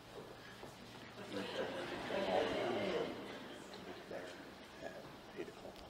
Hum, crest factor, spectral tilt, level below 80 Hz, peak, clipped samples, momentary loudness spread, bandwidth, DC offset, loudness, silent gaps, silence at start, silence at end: none; 22 dB; -4.5 dB/octave; -70 dBFS; -24 dBFS; under 0.1%; 15 LU; 16 kHz; under 0.1%; -44 LUFS; none; 0 s; 0 s